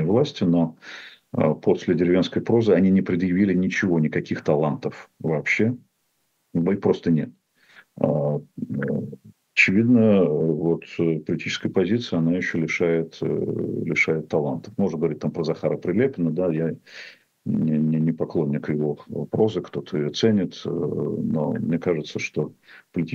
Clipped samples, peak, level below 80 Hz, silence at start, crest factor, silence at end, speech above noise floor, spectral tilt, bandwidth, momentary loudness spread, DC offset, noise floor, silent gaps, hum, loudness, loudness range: under 0.1%; -2 dBFS; -60 dBFS; 0 s; 20 dB; 0 s; 48 dB; -7 dB/octave; 7.6 kHz; 11 LU; under 0.1%; -71 dBFS; none; none; -23 LUFS; 4 LU